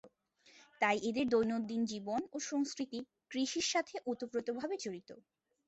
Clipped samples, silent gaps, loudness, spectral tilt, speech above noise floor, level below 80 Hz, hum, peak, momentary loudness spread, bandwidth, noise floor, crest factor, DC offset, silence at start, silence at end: under 0.1%; none; -37 LUFS; -3 dB/octave; 31 dB; -74 dBFS; none; -18 dBFS; 10 LU; 8.2 kHz; -67 dBFS; 20 dB; under 0.1%; 0.05 s; 0.5 s